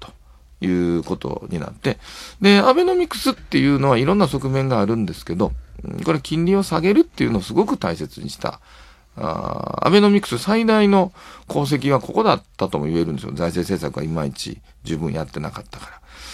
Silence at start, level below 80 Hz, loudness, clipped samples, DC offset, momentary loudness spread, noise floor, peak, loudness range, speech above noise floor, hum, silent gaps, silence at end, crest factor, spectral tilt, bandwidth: 0 s; -44 dBFS; -20 LUFS; under 0.1%; under 0.1%; 15 LU; -47 dBFS; 0 dBFS; 5 LU; 28 dB; none; none; 0 s; 20 dB; -6.5 dB/octave; 14.5 kHz